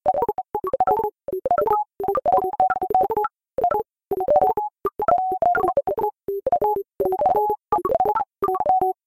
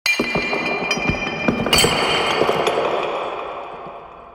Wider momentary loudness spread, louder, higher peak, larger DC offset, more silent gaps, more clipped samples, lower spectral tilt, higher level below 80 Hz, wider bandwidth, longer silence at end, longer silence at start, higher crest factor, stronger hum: second, 7 LU vs 17 LU; second, -22 LUFS vs -19 LUFS; about the same, -6 dBFS vs -4 dBFS; neither; neither; neither; first, -8 dB/octave vs -3 dB/octave; second, -52 dBFS vs -42 dBFS; second, 15.5 kHz vs over 20 kHz; first, 0.15 s vs 0 s; about the same, 0.05 s vs 0.05 s; about the same, 16 dB vs 18 dB; neither